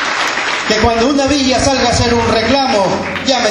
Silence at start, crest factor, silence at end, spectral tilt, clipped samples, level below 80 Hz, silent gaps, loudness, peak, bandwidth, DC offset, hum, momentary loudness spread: 0 s; 12 dB; 0 s; -3.5 dB/octave; under 0.1%; -30 dBFS; none; -12 LUFS; 0 dBFS; 13 kHz; under 0.1%; none; 3 LU